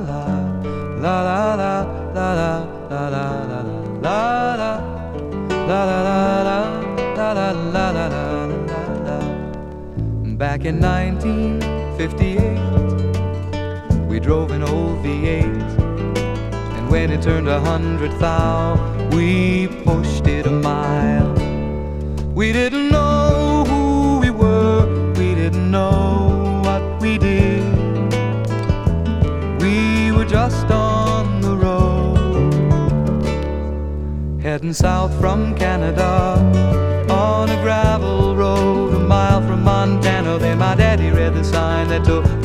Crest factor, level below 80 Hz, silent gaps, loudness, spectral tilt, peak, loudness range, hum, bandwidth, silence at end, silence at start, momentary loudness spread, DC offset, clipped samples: 16 dB; -26 dBFS; none; -18 LUFS; -7.5 dB/octave; 0 dBFS; 5 LU; none; 12 kHz; 0 s; 0 s; 8 LU; under 0.1%; under 0.1%